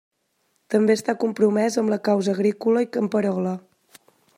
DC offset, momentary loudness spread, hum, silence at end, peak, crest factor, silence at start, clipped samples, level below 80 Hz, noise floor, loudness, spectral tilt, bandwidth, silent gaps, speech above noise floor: under 0.1%; 5 LU; none; 0.8 s; -8 dBFS; 16 dB; 0.7 s; under 0.1%; -74 dBFS; -70 dBFS; -22 LUFS; -6 dB/octave; 15 kHz; none; 49 dB